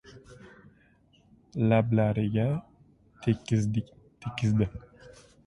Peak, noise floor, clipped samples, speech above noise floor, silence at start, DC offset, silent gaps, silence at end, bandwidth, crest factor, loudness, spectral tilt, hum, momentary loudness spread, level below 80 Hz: -10 dBFS; -62 dBFS; under 0.1%; 36 dB; 0.05 s; under 0.1%; none; 0.4 s; 10.5 kHz; 20 dB; -28 LUFS; -8 dB/octave; none; 16 LU; -54 dBFS